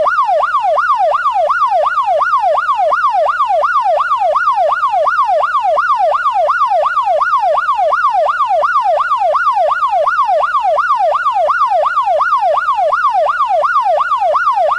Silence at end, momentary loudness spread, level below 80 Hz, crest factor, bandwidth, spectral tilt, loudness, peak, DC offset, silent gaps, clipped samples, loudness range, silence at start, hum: 0 s; 1 LU; -52 dBFS; 8 dB; 11 kHz; -1.5 dB/octave; -12 LUFS; -4 dBFS; under 0.1%; none; under 0.1%; 0 LU; 0 s; none